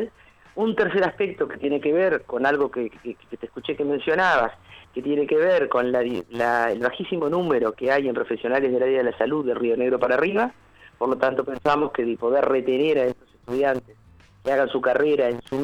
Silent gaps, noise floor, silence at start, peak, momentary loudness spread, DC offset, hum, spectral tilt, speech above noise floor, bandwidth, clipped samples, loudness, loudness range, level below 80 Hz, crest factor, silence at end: none; -51 dBFS; 0 s; -6 dBFS; 10 LU; under 0.1%; none; -6.5 dB/octave; 28 dB; 10 kHz; under 0.1%; -23 LUFS; 2 LU; -58 dBFS; 16 dB; 0 s